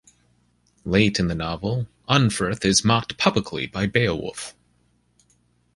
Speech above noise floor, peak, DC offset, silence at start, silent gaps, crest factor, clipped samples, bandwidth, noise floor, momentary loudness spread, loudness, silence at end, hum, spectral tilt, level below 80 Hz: 42 dB; -2 dBFS; under 0.1%; 0.85 s; none; 22 dB; under 0.1%; 11.5 kHz; -64 dBFS; 11 LU; -22 LUFS; 1.25 s; 60 Hz at -45 dBFS; -4.5 dB/octave; -46 dBFS